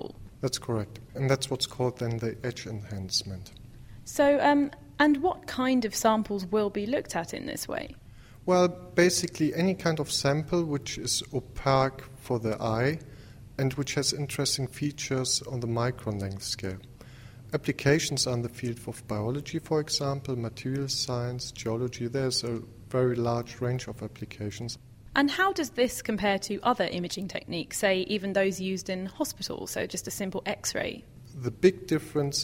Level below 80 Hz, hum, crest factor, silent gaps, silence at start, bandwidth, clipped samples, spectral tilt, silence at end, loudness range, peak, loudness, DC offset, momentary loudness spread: -54 dBFS; none; 20 dB; none; 0 s; 16 kHz; under 0.1%; -4.5 dB/octave; 0 s; 4 LU; -8 dBFS; -29 LUFS; under 0.1%; 13 LU